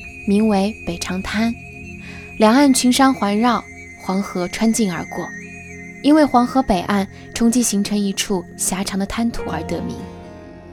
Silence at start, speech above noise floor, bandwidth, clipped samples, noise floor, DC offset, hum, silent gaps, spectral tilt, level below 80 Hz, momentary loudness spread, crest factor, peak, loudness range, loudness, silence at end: 0 s; 19 dB; 18.5 kHz; under 0.1%; -37 dBFS; under 0.1%; none; none; -4.5 dB/octave; -42 dBFS; 20 LU; 18 dB; 0 dBFS; 3 LU; -18 LUFS; 0 s